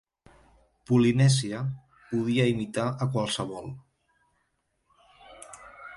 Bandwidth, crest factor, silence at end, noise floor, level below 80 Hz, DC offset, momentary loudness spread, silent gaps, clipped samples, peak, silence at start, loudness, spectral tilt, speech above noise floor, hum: 11.5 kHz; 18 dB; 0 s; -75 dBFS; -60 dBFS; under 0.1%; 23 LU; none; under 0.1%; -10 dBFS; 0.9 s; -26 LUFS; -6 dB/octave; 50 dB; none